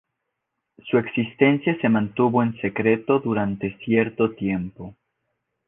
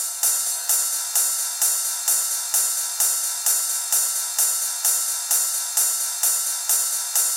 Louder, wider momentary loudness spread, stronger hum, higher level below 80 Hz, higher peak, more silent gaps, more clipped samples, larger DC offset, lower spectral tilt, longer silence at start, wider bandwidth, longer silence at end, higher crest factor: second, -22 LUFS vs -19 LUFS; first, 10 LU vs 1 LU; neither; first, -56 dBFS vs under -90 dBFS; about the same, -4 dBFS vs -6 dBFS; neither; neither; neither; first, -10.5 dB/octave vs 9 dB/octave; first, 0.85 s vs 0 s; second, 3.8 kHz vs 17 kHz; first, 0.75 s vs 0 s; about the same, 20 dB vs 16 dB